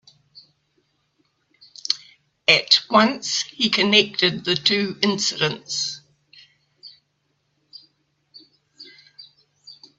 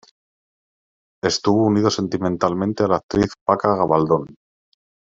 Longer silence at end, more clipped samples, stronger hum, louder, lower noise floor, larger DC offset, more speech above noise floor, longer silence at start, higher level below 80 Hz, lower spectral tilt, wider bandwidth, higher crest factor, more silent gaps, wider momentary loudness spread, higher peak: about the same, 0.75 s vs 0.8 s; neither; neither; about the same, -19 LUFS vs -19 LUFS; second, -71 dBFS vs under -90 dBFS; neither; second, 50 dB vs over 71 dB; first, 1.9 s vs 1.25 s; second, -68 dBFS vs -50 dBFS; second, -2.5 dB/octave vs -5.5 dB/octave; about the same, 8 kHz vs 7.8 kHz; about the same, 24 dB vs 20 dB; second, none vs 3.03-3.09 s, 3.41-3.46 s; first, 11 LU vs 5 LU; about the same, 0 dBFS vs -2 dBFS